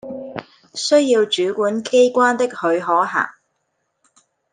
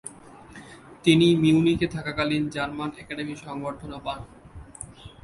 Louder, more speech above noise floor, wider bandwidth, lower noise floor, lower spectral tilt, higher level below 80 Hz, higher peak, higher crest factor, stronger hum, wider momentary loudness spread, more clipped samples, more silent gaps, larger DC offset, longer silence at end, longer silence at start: first, -17 LUFS vs -24 LUFS; first, 55 dB vs 23 dB; second, 9.6 kHz vs 11.5 kHz; first, -71 dBFS vs -46 dBFS; second, -3 dB/octave vs -6 dB/octave; second, -72 dBFS vs -50 dBFS; about the same, -2 dBFS vs -4 dBFS; about the same, 16 dB vs 20 dB; neither; second, 16 LU vs 26 LU; neither; neither; neither; first, 1.2 s vs 0.15 s; about the same, 0.05 s vs 0.05 s